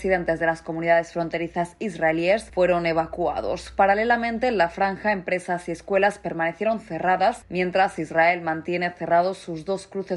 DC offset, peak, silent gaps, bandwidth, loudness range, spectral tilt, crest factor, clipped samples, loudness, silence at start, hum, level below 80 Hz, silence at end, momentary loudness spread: under 0.1%; -8 dBFS; none; 11.5 kHz; 1 LU; -5.5 dB/octave; 16 dB; under 0.1%; -23 LUFS; 0 s; none; -50 dBFS; 0 s; 8 LU